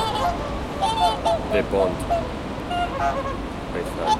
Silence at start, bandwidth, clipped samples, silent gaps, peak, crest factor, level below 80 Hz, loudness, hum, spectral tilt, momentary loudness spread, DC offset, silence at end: 0 s; 16 kHz; under 0.1%; none; -8 dBFS; 16 dB; -36 dBFS; -24 LUFS; none; -5 dB/octave; 8 LU; under 0.1%; 0 s